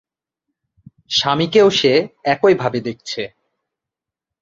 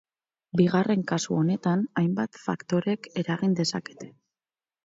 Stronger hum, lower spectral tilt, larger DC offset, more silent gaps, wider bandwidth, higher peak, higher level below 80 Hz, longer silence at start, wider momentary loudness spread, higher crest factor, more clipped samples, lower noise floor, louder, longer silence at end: neither; second, -4.5 dB/octave vs -6 dB/octave; neither; neither; about the same, 7.6 kHz vs 7.8 kHz; first, -2 dBFS vs -8 dBFS; first, -56 dBFS vs -68 dBFS; first, 1.1 s vs 0.55 s; first, 13 LU vs 10 LU; about the same, 18 dB vs 18 dB; neither; second, -86 dBFS vs under -90 dBFS; first, -16 LUFS vs -26 LUFS; first, 1.15 s vs 0.75 s